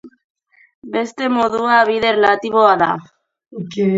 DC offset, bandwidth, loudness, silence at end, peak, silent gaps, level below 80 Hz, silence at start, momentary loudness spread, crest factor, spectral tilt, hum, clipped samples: under 0.1%; 7.8 kHz; -15 LUFS; 0 s; 0 dBFS; 0.24-0.35 s, 0.75-0.82 s; -58 dBFS; 0.05 s; 14 LU; 16 dB; -5.5 dB/octave; none; under 0.1%